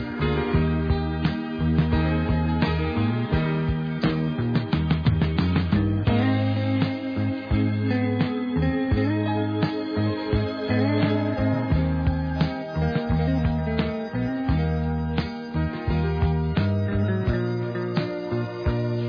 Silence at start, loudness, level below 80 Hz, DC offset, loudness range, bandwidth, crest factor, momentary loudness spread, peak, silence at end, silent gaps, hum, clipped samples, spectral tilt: 0 s; -24 LUFS; -34 dBFS; under 0.1%; 2 LU; 5.4 kHz; 14 dB; 5 LU; -8 dBFS; 0 s; none; none; under 0.1%; -9.5 dB/octave